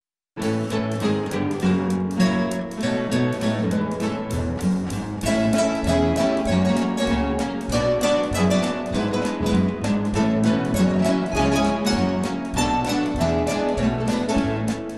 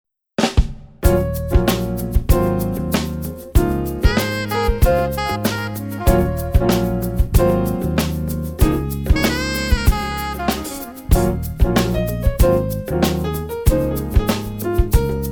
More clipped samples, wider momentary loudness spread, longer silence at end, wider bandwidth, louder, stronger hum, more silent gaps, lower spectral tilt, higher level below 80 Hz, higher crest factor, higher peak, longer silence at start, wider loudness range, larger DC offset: neither; about the same, 5 LU vs 6 LU; about the same, 0 s vs 0 s; second, 13.5 kHz vs over 20 kHz; second, -22 LUFS vs -19 LUFS; neither; neither; about the same, -6 dB/octave vs -6 dB/octave; second, -38 dBFS vs -22 dBFS; about the same, 14 dB vs 16 dB; second, -6 dBFS vs 0 dBFS; about the same, 0.35 s vs 0.4 s; about the same, 2 LU vs 1 LU; first, 0.2% vs under 0.1%